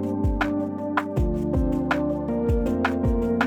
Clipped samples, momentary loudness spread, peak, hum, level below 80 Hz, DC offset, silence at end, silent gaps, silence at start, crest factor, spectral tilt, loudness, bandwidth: under 0.1%; 2 LU; -8 dBFS; none; -30 dBFS; under 0.1%; 0 s; none; 0 s; 16 dB; -8 dB/octave; -25 LUFS; 13.5 kHz